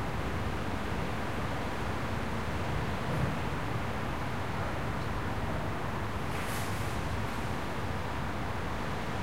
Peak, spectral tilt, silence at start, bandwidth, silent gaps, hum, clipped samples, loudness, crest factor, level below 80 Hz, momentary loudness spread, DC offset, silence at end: -18 dBFS; -6 dB/octave; 0 s; 16 kHz; none; none; under 0.1%; -35 LUFS; 14 dB; -44 dBFS; 2 LU; 1%; 0 s